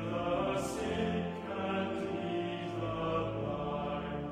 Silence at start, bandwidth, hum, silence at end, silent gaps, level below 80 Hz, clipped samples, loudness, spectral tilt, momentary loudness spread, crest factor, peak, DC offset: 0 s; 15 kHz; none; 0 s; none; -54 dBFS; under 0.1%; -36 LUFS; -6 dB/octave; 4 LU; 14 dB; -20 dBFS; under 0.1%